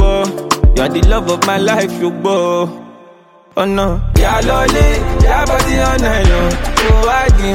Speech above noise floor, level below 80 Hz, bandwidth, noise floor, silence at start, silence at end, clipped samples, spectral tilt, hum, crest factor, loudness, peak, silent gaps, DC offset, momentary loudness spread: 31 dB; -14 dBFS; 16.5 kHz; -43 dBFS; 0 s; 0 s; under 0.1%; -5 dB/octave; none; 12 dB; -13 LUFS; 0 dBFS; none; under 0.1%; 5 LU